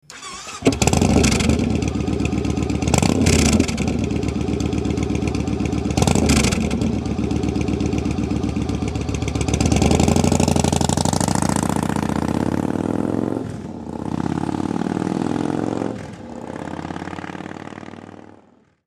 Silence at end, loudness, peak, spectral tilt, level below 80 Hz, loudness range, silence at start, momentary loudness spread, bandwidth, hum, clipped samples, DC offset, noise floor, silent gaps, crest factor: 0.7 s; -20 LUFS; 0 dBFS; -5.5 dB/octave; -30 dBFS; 6 LU; 0.1 s; 15 LU; 15.5 kHz; none; under 0.1%; under 0.1%; -53 dBFS; none; 20 dB